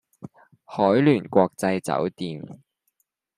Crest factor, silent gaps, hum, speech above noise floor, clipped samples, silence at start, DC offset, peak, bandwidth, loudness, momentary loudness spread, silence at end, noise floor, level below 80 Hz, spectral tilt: 20 dB; none; none; 51 dB; under 0.1%; 0.2 s; under 0.1%; -4 dBFS; 15 kHz; -22 LUFS; 16 LU; 0.8 s; -73 dBFS; -66 dBFS; -7 dB/octave